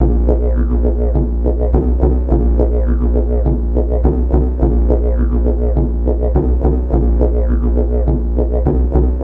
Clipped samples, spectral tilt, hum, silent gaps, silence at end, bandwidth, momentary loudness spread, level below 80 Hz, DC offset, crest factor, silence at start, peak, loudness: under 0.1%; -13 dB/octave; none; none; 0 s; 2 kHz; 2 LU; -14 dBFS; under 0.1%; 12 dB; 0 s; 0 dBFS; -16 LUFS